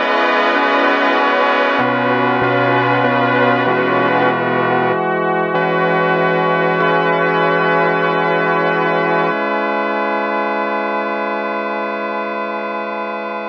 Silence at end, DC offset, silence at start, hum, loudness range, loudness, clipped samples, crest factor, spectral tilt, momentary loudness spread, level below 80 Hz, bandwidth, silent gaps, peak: 0 s; under 0.1%; 0 s; none; 5 LU; -15 LUFS; under 0.1%; 16 dB; -7 dB/octave; 7 LU; -64 dBFS; 7.2 kHz; none; 0 dBFS